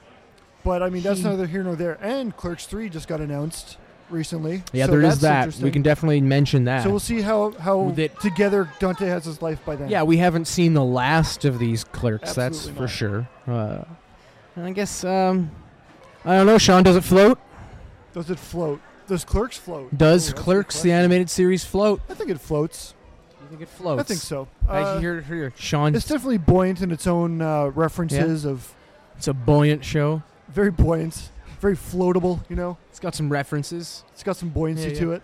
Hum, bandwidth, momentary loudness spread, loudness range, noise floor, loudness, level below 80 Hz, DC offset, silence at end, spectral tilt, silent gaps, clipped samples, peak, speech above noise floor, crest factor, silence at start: none; 15.5 kHz; 14 LU; 9 LU; -52 dBFS; -21 LUFS; -38 dBFS; under 0.1%; 0.05 s; -6 dB/octave; none; under 0.1%; -4 dBFS; 31 dB; 18 dB; 0.65 s